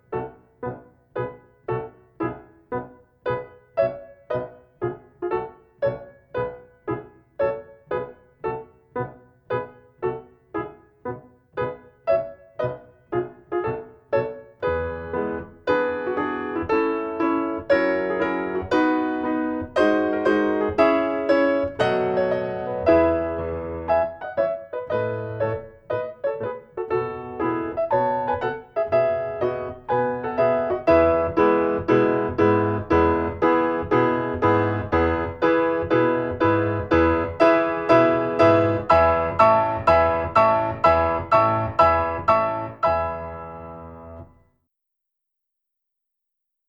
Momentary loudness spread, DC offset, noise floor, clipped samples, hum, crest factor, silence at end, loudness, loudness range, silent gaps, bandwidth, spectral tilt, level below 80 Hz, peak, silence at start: 15 LU; under 0.1%; -81 dBFS; under 0.1%; none; 20 dB; 2.45 s; -22 LUFS; 12 LU; none; 7.4 kHz; -8 dB/octave; -46 dBFS; -2 dBFS; 0.1 s